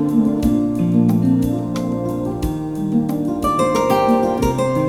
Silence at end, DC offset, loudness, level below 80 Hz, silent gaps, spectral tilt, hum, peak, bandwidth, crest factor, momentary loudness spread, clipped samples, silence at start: 0 s; under 0.1%; -18 LUFS; -34 dBFS; none; -7.5 dB/octave; none; -2 dBFS; 16.5 kHz; 14 dB; 7 LU; under 0.1%; 0 s